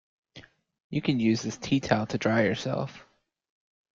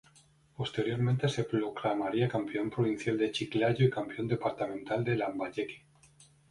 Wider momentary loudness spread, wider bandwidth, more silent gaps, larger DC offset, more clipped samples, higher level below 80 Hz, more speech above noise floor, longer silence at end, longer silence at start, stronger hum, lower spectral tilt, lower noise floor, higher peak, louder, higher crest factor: about the same, 8 LU vs 7 LU; second, 7.6 kHz vs 11.5 kHz; first, 0.84-0.90 s vs none; neither; neither; about the same, -62 dBFS vs -64 dBFS; second, 26 dB vs 32 dB; first, 0.95 s vs 0.25 s; second, 0.35 s vs 0.6 s; neither; about the same, -6 dB/octave vs -7 dB/octave; second, -53 dBFS vs -63 dBFS; first, -6 dBFS vs -14 dBFS; first, -28 LUFS vs -32 LUFS; about the same, 22 dB vs 18 dB